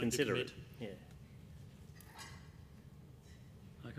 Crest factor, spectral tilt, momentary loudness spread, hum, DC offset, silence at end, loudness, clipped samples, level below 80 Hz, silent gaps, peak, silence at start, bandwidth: 24 dB; -4.5 dB/octave; 22 LU; none; under 0.1%; 0 s; -42 LUFS; under 0.1%; -64 dBFS; none; -20 dBFS; 0 s; 15.5 kHz